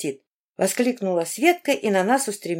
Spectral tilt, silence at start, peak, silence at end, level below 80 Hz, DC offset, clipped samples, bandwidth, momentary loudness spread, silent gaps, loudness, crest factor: -4 dB/octave; 0 s; -4 dBFS; 0 s; -78 dBFS; under 0.1%; under 0.1%; 16.5 kHz; 6 LU; 0.27-0.55 s; -22 LUFS; 18 dB